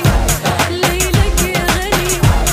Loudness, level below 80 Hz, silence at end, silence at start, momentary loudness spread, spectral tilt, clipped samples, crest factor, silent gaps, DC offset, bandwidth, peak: -14 LUFS; -18 dBFS; 0 s; 0 s; 2 LU; -4 dB/octave; under 0.1%; 14 dB; none; under 0.1%; 16 kHz; 0 dBFS